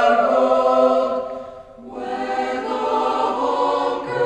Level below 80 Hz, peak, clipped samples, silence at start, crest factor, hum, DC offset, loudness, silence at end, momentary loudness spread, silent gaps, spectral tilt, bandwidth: -56 dBFS; -4 dBFS; under 0.1%; 0 s; 16 dB; none; under 0.1%; -19 LUFS; 0 s; 16 LU; none; -5 dB/octave; 9.6 kHz